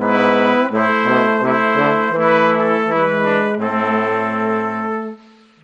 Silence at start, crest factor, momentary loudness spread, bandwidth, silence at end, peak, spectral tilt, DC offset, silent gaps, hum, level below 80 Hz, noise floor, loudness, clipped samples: 0 s; 14 dB; 6 LU; 8.2 kHz; 0.5 s; -2 dBFS; -7 dB/octave; under 0.1%; none; none; -62 dBFS; -44 dBFS; -16 LUFS; under 0.1%